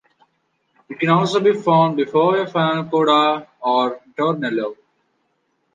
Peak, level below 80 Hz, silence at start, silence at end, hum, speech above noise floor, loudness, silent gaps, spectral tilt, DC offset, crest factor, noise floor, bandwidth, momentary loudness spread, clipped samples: -2 dBFS; -70 dBFS; 0.9 s; 1 s; none; 51 dB; -18 LUFS; none; -6.5 dB/octave; under 0.1%; 16 dB; -68 dBFS; 9.4 kHz; 8 LU; under 0.1%